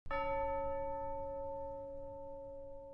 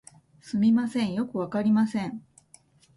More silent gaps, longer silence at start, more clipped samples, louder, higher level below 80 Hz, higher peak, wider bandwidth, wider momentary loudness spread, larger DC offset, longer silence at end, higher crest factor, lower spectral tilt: neither; second, 0.05 s vs 0.45 s; neither; second, -42 LUFS vs -26 LUFS; first, -52 dBFS vs -66 dBFS; second, -26 dBFS vs -14 dBFS; second, 5.6 kHz vs 11.5 kHz; about the same, 11 LU vs 11 LU; neither; second, 0 s vs 0.75 s; about the same, 14 dB vs 14 dB; about the same, -8 dB/octave vs -7 dB/octave